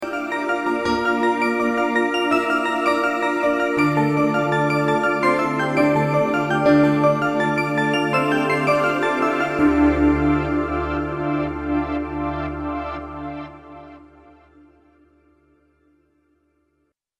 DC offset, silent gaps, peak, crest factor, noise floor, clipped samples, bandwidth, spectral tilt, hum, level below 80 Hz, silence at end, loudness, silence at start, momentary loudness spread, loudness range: under 0.1%; none; -4 dBFS; 16 dB; -70 dBFS; under 0.1%; 14 kHz; -6.5 dB/octave; none; -40 dBFS; 3.15 s; -20 LUFS; 0 s; 9 LU; 11 LU